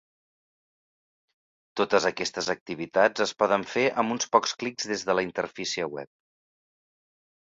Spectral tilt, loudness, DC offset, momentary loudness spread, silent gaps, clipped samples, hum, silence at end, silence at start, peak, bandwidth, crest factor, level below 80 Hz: -3 dB/octave; -26 LUFS; under 0.1%; 8 LU; 2.61-2.66 s; under 0.1%; none; 1.35 s; 1.75 s; -4 dBFS; 7.8 kHz; 26 dB; -68 dBFS